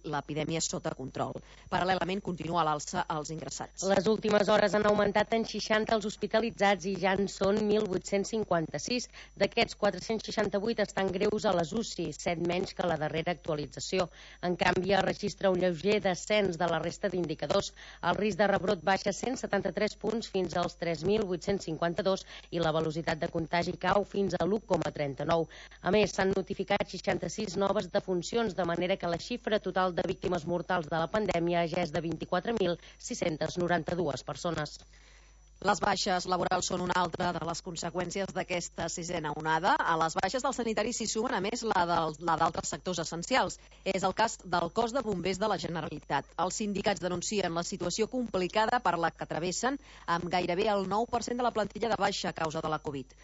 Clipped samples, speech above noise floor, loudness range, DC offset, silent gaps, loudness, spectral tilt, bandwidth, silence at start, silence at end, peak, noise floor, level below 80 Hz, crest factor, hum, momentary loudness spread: under 0.1%; 26 dB; 3 LU; under 0.1%; none; -31 LUFS; -4.5 dB/octave; 8 kHz; 0.05 s; 0 s; -12 dBFS; -57 dBFS; -56 dBFS; 20 dB; none; 7 LU